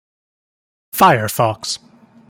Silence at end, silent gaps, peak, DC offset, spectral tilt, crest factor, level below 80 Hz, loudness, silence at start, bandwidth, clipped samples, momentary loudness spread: 0.55 s; none; 0 dBFS; under 0.1%; -4 dB/octave; 18 dB; -56 dBFS; -15 LUFS; 0.95 s; 17 kHz; under 0.1%; 14 LU